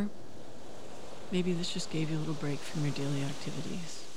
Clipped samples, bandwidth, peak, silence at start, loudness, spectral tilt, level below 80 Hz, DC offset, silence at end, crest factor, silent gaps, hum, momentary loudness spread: under 0.1%; 15 kHz; -18 dBFS; 0 s; -35 LUFS; -5.5 dB/octave; -68 dBFS; 2%; 0 s; 16 dB; none; none; 16 LU